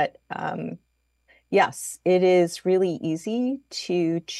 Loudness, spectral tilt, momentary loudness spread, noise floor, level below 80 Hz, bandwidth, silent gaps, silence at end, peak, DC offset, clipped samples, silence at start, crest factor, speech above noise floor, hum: -24 LUFS; -5 dB/octave; 12 LU; -64 dBFS; -70 dBFS; 12.5 kHz; none; 0 s; -6 dBFS; under 0.1%; under 0.1%; 0 s; 18 dB; 41 dB; none